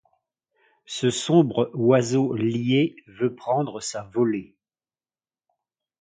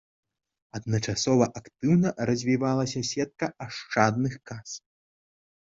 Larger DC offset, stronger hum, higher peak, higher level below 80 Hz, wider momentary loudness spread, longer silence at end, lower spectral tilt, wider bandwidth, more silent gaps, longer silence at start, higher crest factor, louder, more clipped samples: neither; neither; about the same, -4 dBFS vs -4 dBFS; second, -66 dBFS vs -58 dBFS; second, 9 LU vs 15 LU; first, 1.55 s vs 1 s; about the same, -6 dB/octave vs -5.5 dB/octave; first, 9.6 kHz vs 8 kHz; neither; first, 0.9 s vs 0.75 s; about the same, 20 dB vs 24 dB; first, -23 LUFS vs -26 LUFS; neither